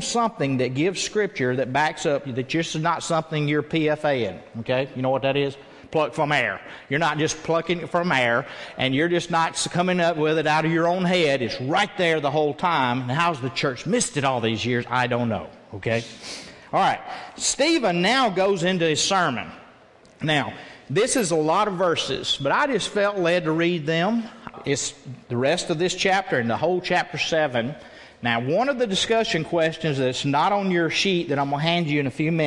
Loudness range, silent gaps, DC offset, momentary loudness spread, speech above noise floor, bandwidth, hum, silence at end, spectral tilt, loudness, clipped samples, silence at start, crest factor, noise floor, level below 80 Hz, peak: 3 LU; none; under 0.1%; 7 LU; 29 dB; 12 kHz; none; 0 s; -4 dB/octave; -23 LUFS; under 0.1%; 0 s; 18 dB; -51 dBFS; -58 dBFS; -6 dBFS